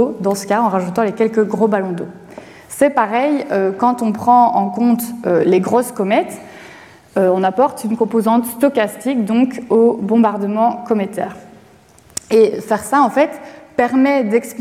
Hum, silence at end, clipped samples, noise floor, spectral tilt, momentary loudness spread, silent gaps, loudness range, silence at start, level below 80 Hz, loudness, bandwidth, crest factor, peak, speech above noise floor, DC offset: none; 0 s; under 0.1%; -46 dBFS; -6 dB/octave; 10 LU; none; 2 LU; 0 s; -60 dBFS; -16 LUFS; 15.5 kHz; 14 dB; -2 dBFS; 31 dB; under 0.1%